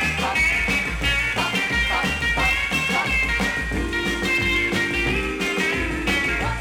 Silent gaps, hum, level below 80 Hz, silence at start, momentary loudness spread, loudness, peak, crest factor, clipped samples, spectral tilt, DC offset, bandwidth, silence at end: none; none; -32 dBFS; 0 s; 4 LU; -20 LUFS; -8 dBFS; 14 dB; under 0.1%; -3.5 dB/octave; under 0.1%; 17.5 kHz; 0 s